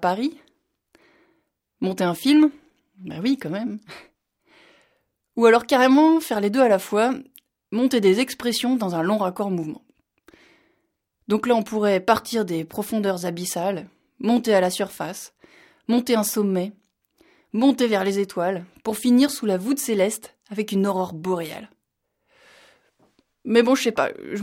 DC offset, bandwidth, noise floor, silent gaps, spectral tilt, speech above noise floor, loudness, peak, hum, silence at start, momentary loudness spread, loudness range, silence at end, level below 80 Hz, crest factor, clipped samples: under 0.1%; 17 kHz; -76 dBFS; none; -5 dB/octave; 55 dB; -22 LUFS; -4 dBFS; none; 0 s; 15 LU; 6 LU; 0 s; -66 dBFS; 20 dB; under 0.1%